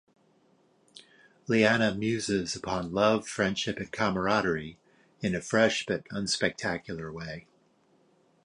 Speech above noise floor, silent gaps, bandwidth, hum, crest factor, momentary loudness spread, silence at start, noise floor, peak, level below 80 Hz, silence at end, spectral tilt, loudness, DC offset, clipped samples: 38 dB; none; 11 kHz; none; 20 dB; 13 LU; 0.95 s; -66 dBFS; -10 dBFS; -58 dBFS; 1.05 s; -4.5 dB/octave; -28 LUFS; under 0.1%; under 0.1%